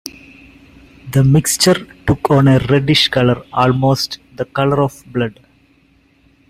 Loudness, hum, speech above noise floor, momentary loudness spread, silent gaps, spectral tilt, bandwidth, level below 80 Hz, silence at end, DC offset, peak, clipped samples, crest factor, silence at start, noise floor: -14 LUFS; none; 40 dB; 11 LU; none; -5 dB/octave; 16 kHz; -40 dBFS; 1.2 s; under 0.1%; 0 dBFS; under 0.1%; 16 dB; 0.05 s; -53 dBFS